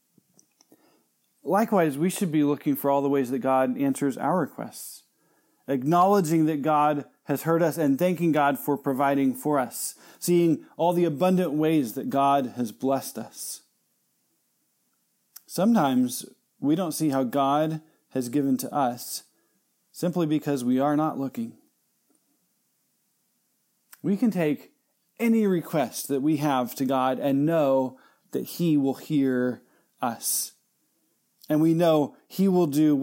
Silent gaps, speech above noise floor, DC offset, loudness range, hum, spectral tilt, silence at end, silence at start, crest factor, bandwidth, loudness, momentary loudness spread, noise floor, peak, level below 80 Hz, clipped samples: none; 48 dB; under 0.1%; 5 LU; none; -6 dB/octave; 0 s; 1.45 s; 16 dB; 17 kHz; -25 LUFS; 12 LU; -72 dBFS; -8 dBFS; -82 dBFS; under 0.1%